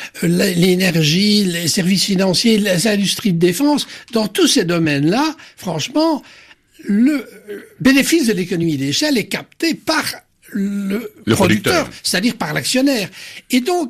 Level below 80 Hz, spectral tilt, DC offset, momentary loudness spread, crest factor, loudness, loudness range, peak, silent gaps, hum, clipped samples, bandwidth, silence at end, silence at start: -52 dBFS; -4.5 dB/octave; under 0.1%; 10 LU; 14 dB; -16 LUFS; 4 LU; -2 dBFS; none; none; under 0.1%; 14.5 kHz; 0 s; 0 s